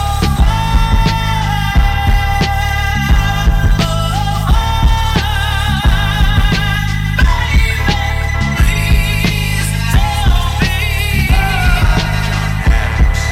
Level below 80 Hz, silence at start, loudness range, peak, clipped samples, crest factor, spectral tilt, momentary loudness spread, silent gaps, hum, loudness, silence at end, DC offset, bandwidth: -14 dBFS; 0 s; 0 LU; 0 dBFS; under 0.1%; 12 dB; -5 dB/octave; 3 LU; none; none; -14 LUFS; 0 s; under 0.1%; 16 kHz